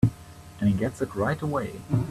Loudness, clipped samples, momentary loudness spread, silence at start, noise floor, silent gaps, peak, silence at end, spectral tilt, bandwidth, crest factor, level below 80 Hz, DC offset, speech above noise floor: -28 LUFS; under 0.1%; 10 LU; 0 s; -45 dBFS; none; -6 dBFS; 0 s; -8 dB/octave; 14 kHz; 20 dB; -48 dBFS; under 0.1%; 19 dB